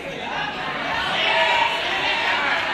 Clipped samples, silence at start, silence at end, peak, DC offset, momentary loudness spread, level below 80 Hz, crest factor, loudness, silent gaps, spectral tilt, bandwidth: under 0.1%; 0 s; 0 s; -8 dBFS; under 0.1%; 9 LU; -52 dBFS; 14 dB; -20 LUFS; none; -2.5 dB/octave; 14 kHz